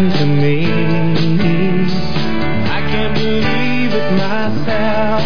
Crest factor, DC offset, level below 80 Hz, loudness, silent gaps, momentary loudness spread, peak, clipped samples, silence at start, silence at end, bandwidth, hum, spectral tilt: 12 dB; 20%; -36 dBFS; -16 LUFS; none; 4 LU; -2 dBFS; under 0.1%; 0 s; 0 s; 5.4 kHz; none; -7.5 dB/octave